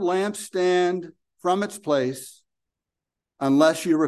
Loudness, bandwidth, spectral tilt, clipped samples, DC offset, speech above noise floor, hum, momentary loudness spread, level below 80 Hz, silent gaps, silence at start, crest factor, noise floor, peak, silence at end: -23 LUFS; 12.5 kHz; -5 dB/octave; under 0.1%; under 0.1%; 65 dB; none; 14 LU; -76 dBFS; none; 0 s; 18 dB; -87 dBFS; -4 dBFS; 0 s